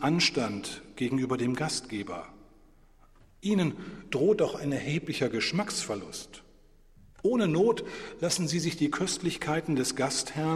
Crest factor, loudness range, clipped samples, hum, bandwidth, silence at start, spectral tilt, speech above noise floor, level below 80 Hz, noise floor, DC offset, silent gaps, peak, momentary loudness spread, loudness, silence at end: 18 dB; 4 LU; under 0.1%; none; 14.5 kHz; 0 s; -4.5 dB/octave; 28 dB; -58 dBFS; -57 dBFS; under 0.1%; none; -12 dBFS; 12 LU; -29 LUFS; 0 s